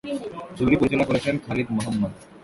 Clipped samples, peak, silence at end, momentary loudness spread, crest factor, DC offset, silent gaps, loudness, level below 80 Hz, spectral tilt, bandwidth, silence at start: under 0.1%; -6 dBFS; 0 s; 11 LU; 18 dB; under 0.1%; none; -24 LUFS; -46 dBFS; -6.5 dB/octave; 11.5 kHz; 0.05 s